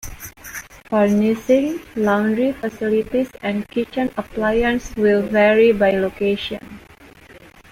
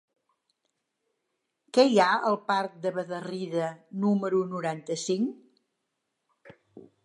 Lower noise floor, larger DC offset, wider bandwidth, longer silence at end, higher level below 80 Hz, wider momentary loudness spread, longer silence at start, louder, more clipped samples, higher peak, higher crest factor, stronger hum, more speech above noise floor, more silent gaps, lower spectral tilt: second, -45 dBFS vs -81 dBFS; neither; first, 16 kHz vs 11.5 kHz; first, 0.35 s vs 0.2 s; first, -44 dBFS vs -84 dBFS; first, 16 LU vs 11 LU; second, 0.05 s vs 1.75 s; first, -19 LUFS vs -27 LUFS; neither; first, -4 dBFS vs -8 dBFS; second, 16 dB vs 22 dB; neither; second, 27 dB vs 55 dB; neither; about the same, -6 dB/octave vs -5 dB/octave